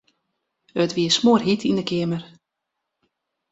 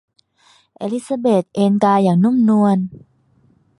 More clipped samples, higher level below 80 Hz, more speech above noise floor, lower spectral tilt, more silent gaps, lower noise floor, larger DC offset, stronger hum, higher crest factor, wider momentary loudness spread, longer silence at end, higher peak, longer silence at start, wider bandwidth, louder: neither; about the same, -62 dBFS vs -60 dBFS; first, 61 dB vs 41 dB; second, -5 dB/octave vs -8 dB/octave; neither; first, -81 dBFS vs -56 dBFS; neither; neither; about the same, 20 dB vs 16 dB; about the same, 12 LU vs 11 LU; first, 1.25 s vs 0.8 s; about the same, -4 dBFS vs -2 dBFS; about the same, 0.75 s vs 0.8 s; second, 8 kHz vs 11.5 kHz; second, -21 LUFS vs -16 LUFS